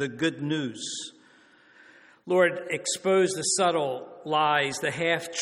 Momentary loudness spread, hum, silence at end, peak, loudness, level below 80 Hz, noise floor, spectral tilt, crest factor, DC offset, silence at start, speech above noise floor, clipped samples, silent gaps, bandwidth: 10 LU; none; 0 s; -8 dBFS; -26 LUFS; -72 dBFS; -57 dBFS; -3 dB/octave; 18 dB; under 0.1%; 0 s; 31 dB; under 0.1%; none; 13.5 kHz